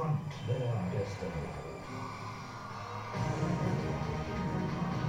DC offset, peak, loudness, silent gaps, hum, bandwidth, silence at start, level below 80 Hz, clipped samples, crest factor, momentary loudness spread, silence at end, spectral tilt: under 0.1%; -20 dBFS; -36 LUFS; none; none; 10.5 kHz; 0 s; -52 dBFS; under 0.1%; 16 dB; 9 LU; 0 s; -7 dB/octave